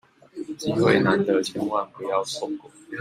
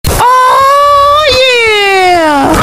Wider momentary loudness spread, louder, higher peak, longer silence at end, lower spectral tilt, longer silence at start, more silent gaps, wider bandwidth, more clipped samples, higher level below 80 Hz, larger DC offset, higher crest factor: first, 18 LU vs 2 LU; second, -24 LUFS vs -5 LUFS; second, -4 dBFS vs 0 dBFS; about the same, 0 s vs 0 s; first, -5.5 dB/octave vs -3.5 dB/octave; first, 0.35 s vs 0.05 s; neither; about the same, 15 kHz vs 16.5 kHz; second, under 0.1% vs 0.5%; second, -62 dBFS vs -26 dBFS; neither; first, 20 dB vs 6 dB